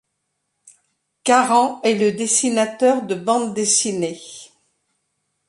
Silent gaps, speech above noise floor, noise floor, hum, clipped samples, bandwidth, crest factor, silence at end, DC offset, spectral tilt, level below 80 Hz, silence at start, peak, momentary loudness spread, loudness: none; 56 dB; -74 dBFS; none; under 0.1%; 11.5 kHz; 18 dB; 1.05 s; under 0.1%; -2.5 dB/octave; -70 dBFS; 1.25 s; -2 dBFS; 11 LU; -18 LUFS